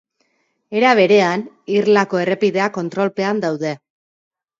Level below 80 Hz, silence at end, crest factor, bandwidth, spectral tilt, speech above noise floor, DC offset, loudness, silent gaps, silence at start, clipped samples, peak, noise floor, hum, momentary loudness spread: -68 dBFS; 0.85 s; 18 dB; 7.6 kHz; -5.5 dB/octave; 49 dB; under 0.1%; -17 LUFS; none; 0.7 s; under 0.1%; 0 dBFS; -66 dBFS; none; 12 LU